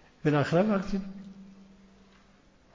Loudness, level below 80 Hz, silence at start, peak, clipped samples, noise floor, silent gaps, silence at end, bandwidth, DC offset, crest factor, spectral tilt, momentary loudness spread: -28 LUFS; -56 dBFS; 0.25 s; -14 dBFS; under 0.1%; -60 dBFS; none; 1.15 s; 7.6 kHz; under 0.1%; 18 dB; -7.5 dB/octave; 23 LU